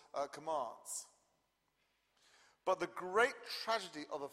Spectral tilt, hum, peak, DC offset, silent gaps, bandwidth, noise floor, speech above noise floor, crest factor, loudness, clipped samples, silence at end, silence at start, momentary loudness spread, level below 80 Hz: -2 dB/octave; none; -18 dBFS; under 0.1%; none; 15.5 kHz; -81 dBFS; 42 dB; 22 dB; -39 LUFS; under 0.1%; 0 s; 0.15 s; 11 LU; -82 dBFS